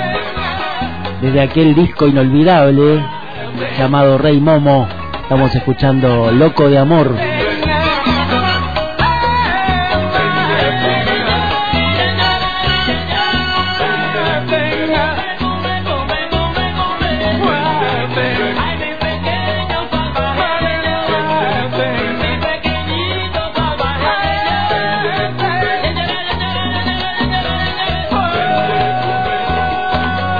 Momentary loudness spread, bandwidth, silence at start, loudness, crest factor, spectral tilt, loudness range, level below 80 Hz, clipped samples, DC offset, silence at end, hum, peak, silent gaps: 8 LU; 5 kHz; 0 s; -14 LUFS; 14 dB; -8 dB/octave; 5 LU; -30 dBFS; under 0.1%; 3%; 0 s; none; 0 dBFS; none